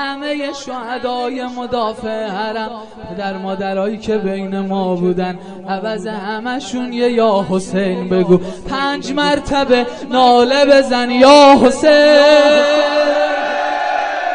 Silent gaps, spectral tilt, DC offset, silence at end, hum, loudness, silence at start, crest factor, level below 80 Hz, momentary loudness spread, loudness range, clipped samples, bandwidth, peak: none; -5 dB/octave; 0.5%; 0 s; none; -14 LUFS; 0 s; 14 dB; -44 dBFS; 15 LU; 12 LU; under 0.1%; 10 kHz; 0 dBFS